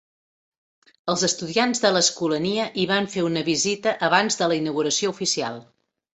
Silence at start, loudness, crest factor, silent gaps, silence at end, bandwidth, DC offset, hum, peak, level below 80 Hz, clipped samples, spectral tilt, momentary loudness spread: 1.05 s; -22 LUFS; 22 dB; none; 0.5 s; 8.4 kHz; under 0.1%; none; -2 dBFS; -64 dBFS; under 0.1%; -3 dB/octave; 5 LU